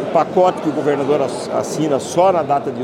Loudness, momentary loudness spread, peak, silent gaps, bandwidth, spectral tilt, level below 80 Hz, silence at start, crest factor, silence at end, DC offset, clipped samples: -17 LUFS; 5 LU; 0 dBFS; none; 15.5 kHz; -5.5 dB/octave; -62 dBFS; 0 s; 16 dB; 0 s; under 0.1%; under 0.1%